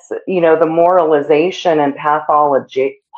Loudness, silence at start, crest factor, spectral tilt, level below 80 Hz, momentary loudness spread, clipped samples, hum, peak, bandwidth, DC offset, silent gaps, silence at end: -13 LUFS; 0.1 s; 14 dB; -6 dB/octave; -62 dBFS; 6 LU; under 0.1%; none; 0 dBFS; 7.6 kHz; under 0.1%; none; 0 s